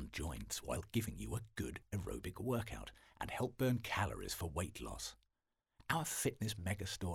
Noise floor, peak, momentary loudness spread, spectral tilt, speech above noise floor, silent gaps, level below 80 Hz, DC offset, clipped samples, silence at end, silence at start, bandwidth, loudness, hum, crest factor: -88 dBFS; -18 dBFS; 9 LU; -4.5 dB/octave; 47 dB; none; -56 dBFS; under 0.1%; under 0.1%; 0 s; 0 s; 17.5 kHz; -42 LUFS; none; 24 dB